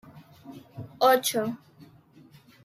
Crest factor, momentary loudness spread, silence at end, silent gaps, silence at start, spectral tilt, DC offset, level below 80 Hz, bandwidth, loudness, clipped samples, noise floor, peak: 20 dB; 25 LU; 1.1 s; none; 0.15 s; -3 dB/octave; under 0.1%; -72 dBFS; 16 kHz; -24 LUFS; under 0.1%; -55 dBFS; -10 dBFS